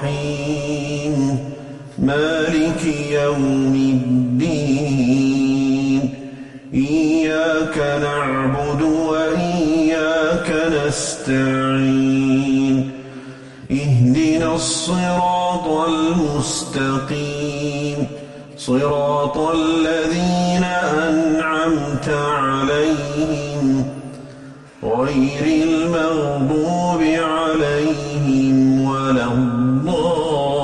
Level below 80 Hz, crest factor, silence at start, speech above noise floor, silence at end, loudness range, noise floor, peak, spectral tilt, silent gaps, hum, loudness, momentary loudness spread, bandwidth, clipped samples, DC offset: -42 dBFS; 12 dB; 0 s; 21 dB; 0 s; 3 LU; -38 dBFS; -6 dBFS; -6 dB/octave; none; none; -18 LUFS; 7 LU; 11.5 kHz; under 0.1%; under 0.1%